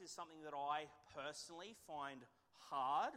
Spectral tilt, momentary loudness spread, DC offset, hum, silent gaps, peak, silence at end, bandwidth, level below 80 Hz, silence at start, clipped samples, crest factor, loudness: -2.5 dB/octave; 15 LU; under 0.1%; none; none; -30 dBFS; 0 s; 16 kHz; -84 dBFS; 0 s; under 0.1%; 16 dB; -48 LUFS